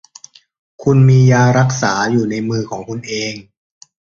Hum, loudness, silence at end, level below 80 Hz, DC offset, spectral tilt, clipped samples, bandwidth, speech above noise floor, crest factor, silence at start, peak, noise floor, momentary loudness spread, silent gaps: none; -14 LUFS; 0.7 s; -48 dBFS; under 0.1%; -6 dB/octave; under 0.1%; 7.4 kHz; 29 dB; 14 dB; 0.8 s; -2 dBFS; -42 dBFS; 15 LU; none